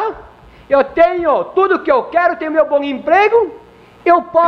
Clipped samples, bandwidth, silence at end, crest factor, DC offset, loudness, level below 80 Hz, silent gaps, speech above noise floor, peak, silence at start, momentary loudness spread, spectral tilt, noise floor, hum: under 0.1%; 6.2 kHz; 0 s; 12 dB; under 0.1%; -14 LUFS; -48 dBFS; none; 27 dB; -2 dBFS; 0 s; 5 LU; -6 dB/octave; -40 dBFS; none